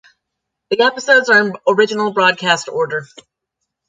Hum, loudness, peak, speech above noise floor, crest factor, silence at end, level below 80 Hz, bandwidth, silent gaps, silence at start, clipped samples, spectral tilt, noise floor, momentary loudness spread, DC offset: none; -14 LUFS; 0 dBFS; 63 dB; 16 dB; 0.85 s; -68 dBFS; 9.4 kHz; none; 0.7 s; under 0.1%; -3 dB/octave; -78 dBFS; 10 LU; under 0.1%